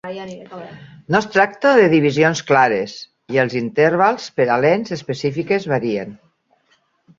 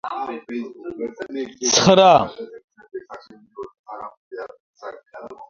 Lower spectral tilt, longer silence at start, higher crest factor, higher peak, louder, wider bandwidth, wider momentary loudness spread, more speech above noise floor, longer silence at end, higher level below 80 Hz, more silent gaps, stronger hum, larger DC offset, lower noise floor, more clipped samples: first, -6 dB/octave vs -3.5 dB/octave; about the same, 0.05 s vs 0.05 s; about the same, 18 dB vs 22 dB; about the same, 0 dBFS vs 0 dBFS; about the same, -17 LUFS vs -18 LUFS; about the same, 7.6 kHz vs 7.6 kHz; second, 19 LU vs 26 LU; first, 44 dB vs 23 dB; first, 1.05 s vs 0.05 s; about the same, -58 dBFS vs -58 dBFS; second, none vs 2.64-2.68 s, 3.79-3.84 s, 4.17-4.31 s, 4.60-4.74 s; neither; neither; first, -62 dBFS vs -42 dBFS; neither